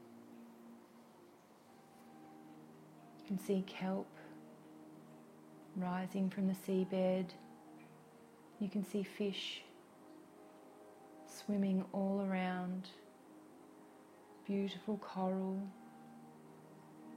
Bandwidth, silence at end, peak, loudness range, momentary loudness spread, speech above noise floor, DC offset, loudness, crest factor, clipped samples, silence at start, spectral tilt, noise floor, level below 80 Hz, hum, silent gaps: 15.5 kHz; 0 s; -26 dBFS; 5 LU; 23 LU; 24 dB; under 0.1%; -40 LUFS; 18 dB; under 0.1%; 0 s; -7 dB/octave; -63 dBFS; -86 dBFS; none; none